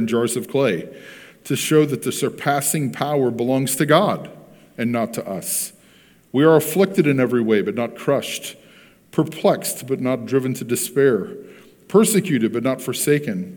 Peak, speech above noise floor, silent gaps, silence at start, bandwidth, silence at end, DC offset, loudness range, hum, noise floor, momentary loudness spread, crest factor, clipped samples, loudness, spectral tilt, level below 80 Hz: 0 dBFS; 32 dB; none; 0 s; 19 kHz; 0 s; under 0.1%; 2 LU; none; -52 dBFS; 12 LU; 20 dB; under 0.1%; -20 LUFS; -5 dB/octave; -68 dBFS